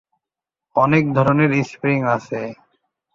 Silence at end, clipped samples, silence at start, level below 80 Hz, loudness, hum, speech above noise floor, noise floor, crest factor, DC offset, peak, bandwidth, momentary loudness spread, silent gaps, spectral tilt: 0.6 s; under 0.1%; 0.75 s; -54 dBFS; -18 LUFS; none; 70 dB; -87 dBFS; 18 dB; under 0.1%; -2 dBFS; 7.6 kHz; 12 LU; none; -8 dB/octave